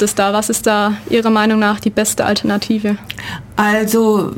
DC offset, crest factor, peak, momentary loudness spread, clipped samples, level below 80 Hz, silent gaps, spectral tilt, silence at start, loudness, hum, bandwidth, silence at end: under 0.1%; 12 dB; -2 dBFS; 8 LU; under 0.1%; -46 dBFS; none; -4 dB/octave; 0 s; -15 LUFS; none; 17 kHz; 0 s